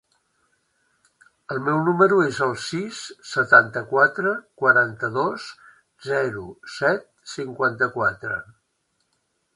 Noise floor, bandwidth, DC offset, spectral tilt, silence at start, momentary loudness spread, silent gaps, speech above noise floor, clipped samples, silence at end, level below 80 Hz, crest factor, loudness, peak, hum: -72 dBFS; 11.5 kHz; under 0.1%; -5 dB/octave; 1.5 s; 17 LU; none; 50 dB; under 0.1%; 1.1 s; -64 dBFS; 22 dB; -21 LUFS; 0 dBFS; none